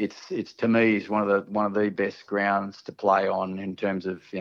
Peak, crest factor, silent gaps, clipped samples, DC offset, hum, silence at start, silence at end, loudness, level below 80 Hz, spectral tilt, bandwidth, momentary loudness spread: -8 dBFS; 18 dB; none; under 0.1%; under 0.1%; none; 0 s; 0 s; -26 LUFS; -74 dBFS; -7 dB/octave; 7 kHz; 10 LU